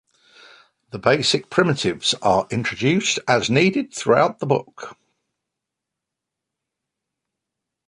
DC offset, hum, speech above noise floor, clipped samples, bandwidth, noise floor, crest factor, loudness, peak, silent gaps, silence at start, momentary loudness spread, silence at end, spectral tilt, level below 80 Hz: under 0.1%; none; 64 dB; under 0.1%; 11 kHz; -84 dBFS; 22 dB; -19 LUFS; 0 dBFS; none; 0.95 s; 7 LU; 2.95 s; -4.5 dB/octave; -58 dBFS